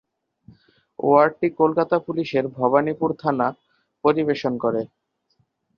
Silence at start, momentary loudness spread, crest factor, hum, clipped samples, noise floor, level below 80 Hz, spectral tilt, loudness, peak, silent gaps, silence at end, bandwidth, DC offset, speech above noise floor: 1 s; 8 LU; 20 dB; none; under 0.1%; -68 dBFS; -64 dBFS; -8 dB/octave; -21 LUFS; -4 dBFS; none; 0.9 s; 6.8 kHz; under 0.1%; 48 dB